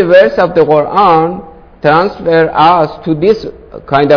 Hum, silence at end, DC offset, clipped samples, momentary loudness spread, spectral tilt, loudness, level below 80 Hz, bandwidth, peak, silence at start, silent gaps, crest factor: none; 0 s; under 0.1%; 2%; 8 LU; -7.5 dB/octave; -10 LUFS; -40 dBFS; 5.4 kHz; 0 dBFS; 0 s; none; 10 dB